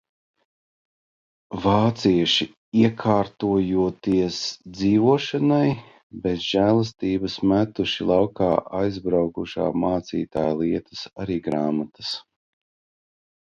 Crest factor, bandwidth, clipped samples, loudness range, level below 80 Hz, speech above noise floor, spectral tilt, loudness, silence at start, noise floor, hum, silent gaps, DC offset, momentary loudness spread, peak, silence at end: 20 dB; 7.4 kHz; under 0.1%; 5 LU; -50 dBFS; over 68 dB; -6.5 dB/octave; -22 LUFS; 1.5 s; under -90 dBFS; none; 2.57-2.72 s, 6.03-6.10 s; under 0.1%; 9 LU; -4 dBFS; 1.2 s